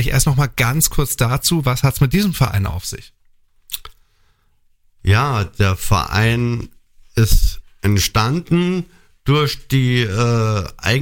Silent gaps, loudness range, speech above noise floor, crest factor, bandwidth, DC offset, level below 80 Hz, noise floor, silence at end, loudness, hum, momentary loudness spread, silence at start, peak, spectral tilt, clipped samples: none; 5 LU; 41 dB; 16 dB; 17 kHz; under 0.1%; -26 dBFS; -57 dBFS; 0 s; -17 LUFS; none; 11 LU; 0 s; -2 dBFS; -5 dB/octave; under 0.1%